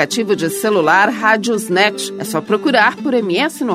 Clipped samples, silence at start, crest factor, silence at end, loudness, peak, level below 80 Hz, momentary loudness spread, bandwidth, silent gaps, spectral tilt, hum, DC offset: under 0.1%; 0 s; 14 dB; 0 s; -15 LUFS; 0 dBFS; -66 dBFS; 6 LU; 16 kHz; none; -3.5 dB/octave; none; under 0.1%